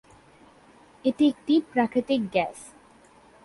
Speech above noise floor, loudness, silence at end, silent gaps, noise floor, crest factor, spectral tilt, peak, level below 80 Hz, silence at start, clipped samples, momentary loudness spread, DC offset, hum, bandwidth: 31 dB; -25 LUFS; 0.8 s; none; -55 dBFS; 16 dB; -5.5 dB/octave; -10 dBFS; -64 dBFS; 1.05 s; under 0.1%; 8 LU; under 0.1%; none; 11.5 kHz